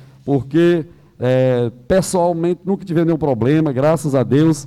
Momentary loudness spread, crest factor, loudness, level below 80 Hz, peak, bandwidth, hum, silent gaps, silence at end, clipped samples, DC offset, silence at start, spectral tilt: 6 LU; 10 dB; -17 LUFS; -46 dBFS; -6 dBFS; 13.5 kHz; none; none; 0 s; under 0.1%; under 0.1%; 0.25 s; -7 dB/octave